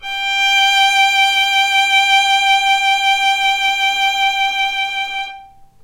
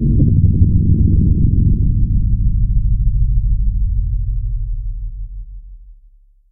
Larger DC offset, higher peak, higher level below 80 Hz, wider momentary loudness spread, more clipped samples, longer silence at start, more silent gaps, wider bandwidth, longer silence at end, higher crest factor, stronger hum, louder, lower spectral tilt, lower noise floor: neither; about the same, -2 dBFS vs -2 dBFS; second, -52 dBFS vs -16 dBFS; second, 7 LU vs 16 LU; neither; about the same, 0 s vs 0 s; neither; first, 16 kHz vs 0.6 kHz; second, 0.2 s vs 0.6 s; about the same, 12 dB vs 12 dB; neither; first, -13 LUFS vs -17 LUFS; second, 3.5 dB/octave vs -18.5 dB/octave; second, -39 dBFS vs -47 dBFS